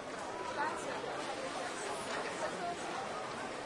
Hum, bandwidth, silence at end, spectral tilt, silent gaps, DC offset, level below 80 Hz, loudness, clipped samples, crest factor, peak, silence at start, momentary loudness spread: none; 11.5 kHz; 0 s; -3 dB/octave; none; under 0.1%; -72 dBFS; -39 LUFS; under 0.1%; 16 dB; -24 dBFS; 0 s; 3 LU